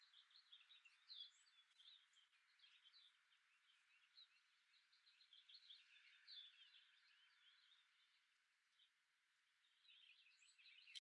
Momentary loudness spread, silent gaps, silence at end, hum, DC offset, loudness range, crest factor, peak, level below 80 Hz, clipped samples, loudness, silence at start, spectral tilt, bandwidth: 10 LU; none; 0.15 s; none; under 0.1%; 2 LU; 30 dB; -42 dBFS; under -90 dBFS; under 0.1%; -65 LUFS; 0 s; 7 dB/octave; 8 kHz